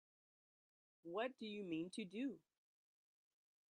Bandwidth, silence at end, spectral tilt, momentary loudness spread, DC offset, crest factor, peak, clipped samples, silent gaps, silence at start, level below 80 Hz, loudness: 10 kHz; 1.3 s; -5.5 dB/octave; 9 LU; under 0.1%; 20 dB; -32 dBFS; under 0.1%; none; 1.05 s; under -90 dBFS; -48 LUFS